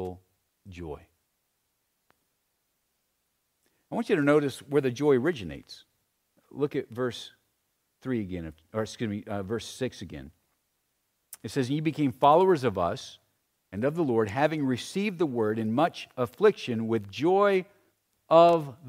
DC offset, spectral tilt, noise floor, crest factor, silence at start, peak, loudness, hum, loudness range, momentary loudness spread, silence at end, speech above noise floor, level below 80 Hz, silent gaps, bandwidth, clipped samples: under 0.1%; -6.5 dB/octave; -77 dBFS; 22 dB; 0 s; -6 dBFS; -27 LUFS; none; 9 LU; 20 LU; 0 s; 50 dB; -62 dBFS; none; 16 kHz; under 0.1%